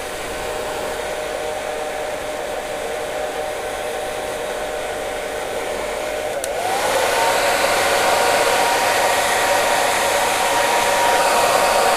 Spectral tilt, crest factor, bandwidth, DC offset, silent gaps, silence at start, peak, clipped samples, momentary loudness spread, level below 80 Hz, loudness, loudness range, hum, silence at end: -1 dB/octave; 18 dB; 16 kHz; under 0.1%; none; 0 s; -2 dBFS; under 0.1%; 9 LU; -46 dBFS; -19 LUFS; 9 LU; none; 0 s